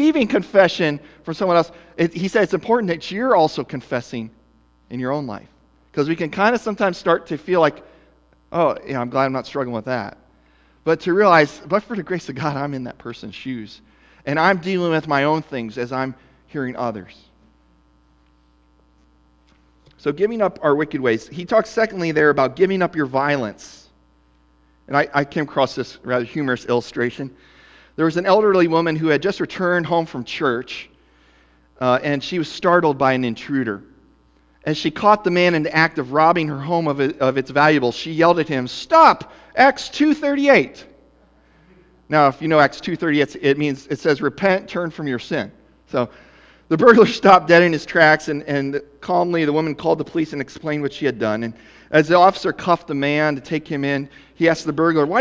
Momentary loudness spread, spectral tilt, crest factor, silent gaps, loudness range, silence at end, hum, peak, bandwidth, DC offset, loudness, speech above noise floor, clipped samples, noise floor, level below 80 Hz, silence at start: 13 LU; -6 dB/octave; 20 dB; none; 7 LU; 0 s; none; 0 dBFS; 8 kHz; under 0.1%; -18 LUFS; 38 dB; under 0.1%; -56 dBFS; -56 dBFS; 0 s